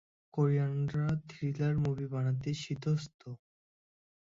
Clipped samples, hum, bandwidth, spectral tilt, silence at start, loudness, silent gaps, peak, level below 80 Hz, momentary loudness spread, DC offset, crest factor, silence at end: under 0.1%; none; 7.6 kHz; -7.5 dB/octave; 0.35 s; -34 LUFS; 3.14-3.19 s; -18 dBFS; -62 dBFS; 15 LU; under 0.1%; 16 dB; 0.9 s